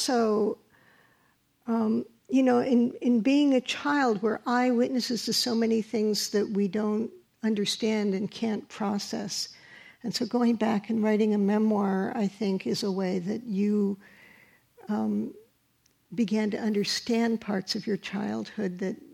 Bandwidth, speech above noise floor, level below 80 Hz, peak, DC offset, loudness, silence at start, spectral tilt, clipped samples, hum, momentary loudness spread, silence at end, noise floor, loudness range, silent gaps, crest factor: 15 kHz; 42 dB; -74 dBFS; -14 dBFS; under 0.1%; -27 LUFS; 0 s; -5 dB/octave; under 0.1%; none; 8 LU; 0.1 s; -68 dBFS; 6 LU; none; 14 dB